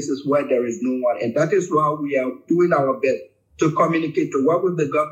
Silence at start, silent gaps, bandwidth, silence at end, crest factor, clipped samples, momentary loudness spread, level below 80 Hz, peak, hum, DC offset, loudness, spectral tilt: 0 s; none; 9 kHz; 0 s; 16 dB; under 0.1%; 5 LU; -68 dBFS; -4 dBFS; none; under 0.1%; -20 LUFS; -6.5 dB/octave